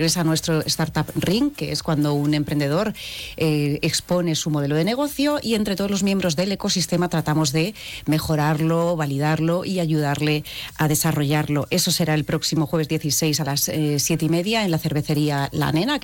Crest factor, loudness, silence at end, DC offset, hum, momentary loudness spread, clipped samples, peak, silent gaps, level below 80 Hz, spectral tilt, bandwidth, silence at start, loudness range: 10 dB; -21 LUFS; 0 s; under 0.1%; none; 3 LU; under 0.1%; -12 dBFS; none; -48 dBFS; -4.5 dB/octave; 17.5 kHz; 0 s; 1 LU